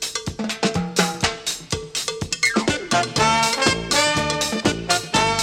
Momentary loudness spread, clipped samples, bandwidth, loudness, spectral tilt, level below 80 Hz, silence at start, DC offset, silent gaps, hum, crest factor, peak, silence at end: 9 LU; under 0.1%; 16.5 kHz; -20 LUFS; -2.5 dB/octave; -44 dBFS; 0 s; under 0.1%; none; none; 20 dB; -2 dBFS; 0 s